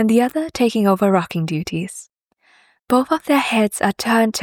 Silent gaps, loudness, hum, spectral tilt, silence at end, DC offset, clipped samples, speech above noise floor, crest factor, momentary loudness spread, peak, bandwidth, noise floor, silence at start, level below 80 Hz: none; -18 LUFS; none; -5 dB/octave; 0 s; under 0.1%; under 0.1%; 40 dB; 16 dB; 9 LU; -2 dBFS; 18.5 kHz; -57 dBFS; 0 s; -56 dBFS